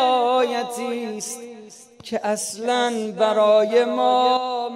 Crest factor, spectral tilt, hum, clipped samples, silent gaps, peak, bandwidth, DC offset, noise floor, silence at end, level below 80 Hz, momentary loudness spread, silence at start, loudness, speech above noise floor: 14 dB; -3 dB/octave; none; under 0.1%; none; -6 dBFS; 16 kHz; under 0.1%; -43 dBFS; 0 s; -74 dBFS; 14 LU; 0 s; -21 LUFS; 23 dB